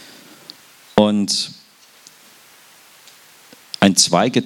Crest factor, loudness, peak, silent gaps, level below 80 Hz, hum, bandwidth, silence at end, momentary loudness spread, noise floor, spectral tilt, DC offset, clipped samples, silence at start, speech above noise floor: 20 dB; -16 LUFS; 0 dBFS; none; -54 dBFS; none; 17.5 kHz; 0 s; 27 LU; -48 dBFS; -3.5 dB/octave; under 0.1%; under 0.1%; 0.95 s; 31 dB